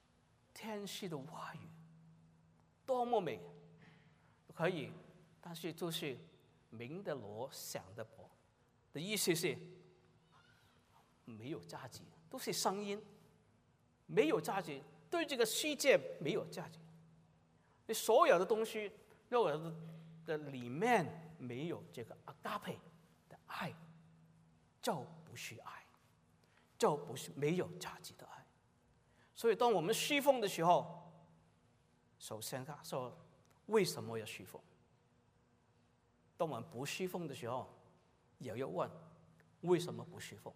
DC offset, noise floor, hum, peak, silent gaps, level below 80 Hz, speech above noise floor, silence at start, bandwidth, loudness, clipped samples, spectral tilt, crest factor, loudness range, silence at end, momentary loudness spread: under 0.1%; -73 dBFS; none; -16 dBFS; none; -82 dBFS; 35 dB; 0.55 s; 15.5 kHz; -39 LUFS; under 0.1%; -4 dB/octave; 24 dB; 11 LU; 0.05 s; 21 LU